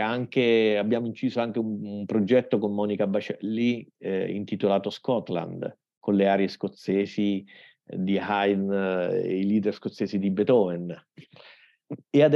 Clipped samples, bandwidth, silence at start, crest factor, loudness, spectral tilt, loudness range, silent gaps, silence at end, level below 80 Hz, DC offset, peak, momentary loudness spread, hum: under 0.1%; 7.2 kHz; 0 s; 18 dB; -26 LUFS; -8 dB/octave; 2 LU; 5.97-6.01 s; 0 s; -80 dBFS; under 0.1%; -8 dBFS; 11 LU; none